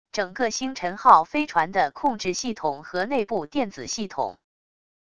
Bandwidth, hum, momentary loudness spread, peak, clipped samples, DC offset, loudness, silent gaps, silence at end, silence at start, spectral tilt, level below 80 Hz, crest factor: 11 kHz; none; 13 LU; -2 dBFS; under 0.1%; 0.4%; -24 LUFS; none; 0.8 s; 0.15 s; -3.5 dB/octave; -60 dBFS; 22 dB